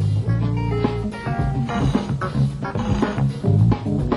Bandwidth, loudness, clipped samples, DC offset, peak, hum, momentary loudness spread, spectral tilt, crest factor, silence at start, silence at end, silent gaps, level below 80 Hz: 11 kHz; -21 LUFS; under 0.1%; under 0.1%; -6 dBFS; none; 6 LU; -8.5 dB/octave; 14 dB; 0 s; 0 s; none; -32 dBFS